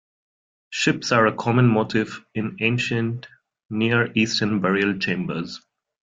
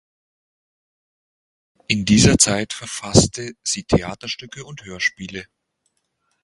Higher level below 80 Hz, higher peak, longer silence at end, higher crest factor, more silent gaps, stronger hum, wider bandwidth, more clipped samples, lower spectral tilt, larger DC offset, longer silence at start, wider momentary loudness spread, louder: second, -60 dBFS vs -40 dBFS; second, -4 dBFS vs 0 dBFS; second, 0.5 s vs 1 s; about the same, 18 dB vs 22 dB; first, 3.65-3.69 s vs none; neither; second, 7.8 kHz vs 11.5 kHz; neither; first, -5.5 dB/octave vs -3.5 dB/octave; neither; second, 0.7 s vs 1.9 s; second, 12 LU vs 20 LU; second, -22 LUFS vs -18 LUFS